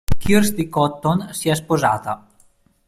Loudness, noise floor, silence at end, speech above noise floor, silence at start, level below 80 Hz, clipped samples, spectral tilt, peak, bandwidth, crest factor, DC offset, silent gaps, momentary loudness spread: -19 LUFS; -56 dBFS; 0.7 s; 37 dB; 0.1 s; -34 dBFS; under 0.1%; -5.5 dB/octave; -2 dBFS; 16 kHz; 16 dB; under 0.1%; none; 7 LU